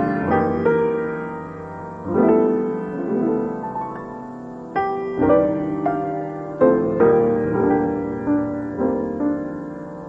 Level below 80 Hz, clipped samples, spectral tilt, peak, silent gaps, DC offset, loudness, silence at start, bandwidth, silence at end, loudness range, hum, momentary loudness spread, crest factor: -50 dBFS; under 0.1%; -10 dB/octave; -4 dBFS; none; under 0.1%; -21 LUFS; 0 s; 5.4 kHz; 0 s; 4 LU; none; 15 LU; 18 dB